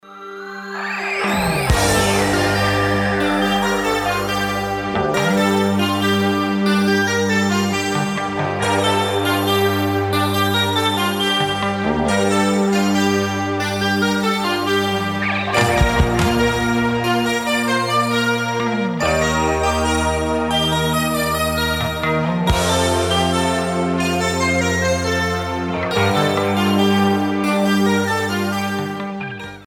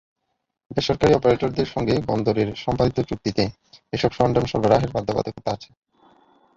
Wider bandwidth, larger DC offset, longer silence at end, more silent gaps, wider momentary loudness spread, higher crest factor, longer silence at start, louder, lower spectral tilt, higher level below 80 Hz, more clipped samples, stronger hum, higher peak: first, 18 kHz vs 7.8 kHz; neither; second, 0 s vs 0.9 s; neither; second, 4 LU vs 9 LU; about the same, 18 dB vs 20 dB; second, 0.05 s vs 0.7 s; first, -18 LUFS vs -22 LUFS; second, -4.5 dB/octave vs -6.5 dB/octave; first, -34 dBFS vs -44 dBFS; neither; neither; about the same, 0 dBFS vs -2 dBFS